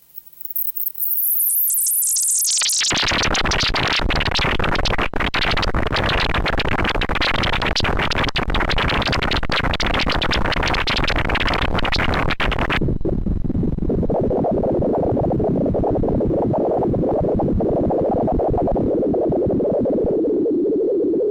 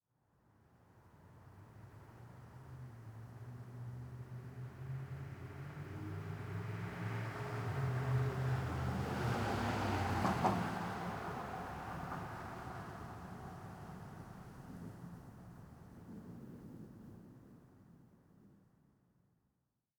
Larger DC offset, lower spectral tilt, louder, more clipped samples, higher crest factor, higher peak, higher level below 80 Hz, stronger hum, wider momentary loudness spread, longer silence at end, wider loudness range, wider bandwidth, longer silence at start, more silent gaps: neither; second, -3.5 dB/octave vs -6.5 dB/octave; first, -19 LUFS vs -42 LUFS; neither; second, 10 dB vs 24 dB; first, -8 dBFS vs -20 dBFS; first, -28 dBFS vs -62 dBFS; neither; second, 5 LU vs 20 LU; second, 0 s vs 1.4 s; second, 4 LU vs 19 LU; second, 17 kHz vs over 20 kHz; second, 0.15 s vs 0.75 s; neither